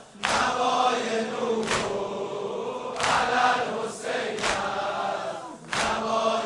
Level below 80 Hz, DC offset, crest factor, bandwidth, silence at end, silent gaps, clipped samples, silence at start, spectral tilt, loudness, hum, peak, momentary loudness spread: -56 dBFS; under 0.1%; 20 dB; 11.5 kHz; 0 s; none; under 0.1%; 0 s; -2.5 dB/octave; -26 LUFS; none; -6 dBFS; 9 LU